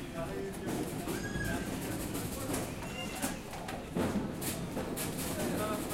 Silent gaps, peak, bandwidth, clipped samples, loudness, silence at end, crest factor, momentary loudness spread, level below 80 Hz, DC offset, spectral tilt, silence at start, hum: none; -22 dBFS; 16 kHz; under 0.1%; -37 LUFS; 0 s; 16 dB; 5 LU; -50 dBFS; under 0.1%; -4.5 dB/octave; 0 s; none